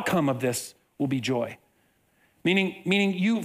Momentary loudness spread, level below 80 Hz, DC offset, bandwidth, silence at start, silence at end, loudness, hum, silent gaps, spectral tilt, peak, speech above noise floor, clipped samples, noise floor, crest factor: 9 LU; -66 dBFS; under 0.1%; 16 kHz; 0 s; 0 s; -26 LUFS; none; none; -5 dB/octave; -10 dBFS; 41 dB; under 0.1%; -67 dBFS; 18 dB